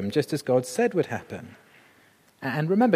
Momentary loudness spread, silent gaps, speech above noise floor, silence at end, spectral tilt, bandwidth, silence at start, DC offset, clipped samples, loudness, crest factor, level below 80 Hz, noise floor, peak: 17 LU; none; 35 dB; 0 s; -6 dB/octave; 15.5 kHz; 0 s; under 0.1%; under 0.1%; -26 LUFS; 20 dB; -72 dBFS; -59 dBFS; -6 dBFS